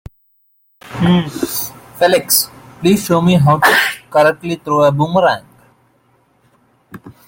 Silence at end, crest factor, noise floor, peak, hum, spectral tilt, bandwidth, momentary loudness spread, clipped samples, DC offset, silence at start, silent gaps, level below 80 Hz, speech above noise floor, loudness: 0.15 s; 16 dB; -58 dBFS; 0 dBFS; none; -4.5 dB/octave; 17 kHz; 11 LU; under 0.1%; under 0.1%; 0.85 s; none; -48 dBFS; 45 dB; -14 LUFS